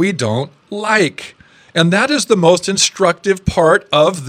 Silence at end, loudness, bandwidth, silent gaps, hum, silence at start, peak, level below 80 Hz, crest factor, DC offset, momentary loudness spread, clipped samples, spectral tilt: 0 s; -14 LUFS; 15 kHz; none; none; 0 s; 0 dBFS; -40 dBFS; 14 dB; under 0.1%; 10 LU; under 0.1%; -4 dB/octave